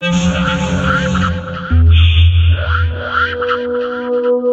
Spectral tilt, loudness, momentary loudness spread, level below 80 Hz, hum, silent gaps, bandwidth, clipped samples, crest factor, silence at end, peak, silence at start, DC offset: -6.5 dB/octave; -14 LUFS; 8 LU; -20 dBFS; none; none; 8 kHz; under 0.1%; 12 dB; 0 s; -2 dBFS; 0 s; under 0.1%